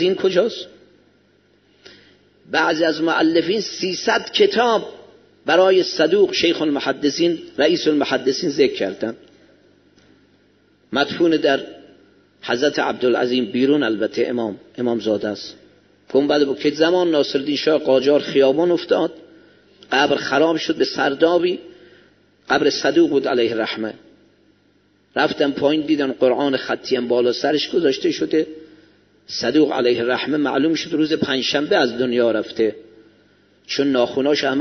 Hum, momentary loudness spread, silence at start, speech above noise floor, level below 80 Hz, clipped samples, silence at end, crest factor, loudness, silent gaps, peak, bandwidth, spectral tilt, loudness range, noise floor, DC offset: 50 Hz at -60 dBFS; 8 LU; 0 s; 40 dB; -64 dBFS; under 0.1%; 0 s; 18 dB; -19 LUFS; none; 0 dBFS; 6.4 kHz; -2.5 dB/octave; 4 LU; -58 dBFS; under 0.1%